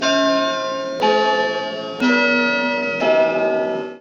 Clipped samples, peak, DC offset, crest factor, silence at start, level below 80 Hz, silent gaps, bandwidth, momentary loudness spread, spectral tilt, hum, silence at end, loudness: under 0.1%; -4 dBFS; under 0.1%; 14 dB; 0 s; -68 dBFS; none; 7.8 kHz; 7 LU; -3.5 dB/octave; none; 0 s; -18 LUFS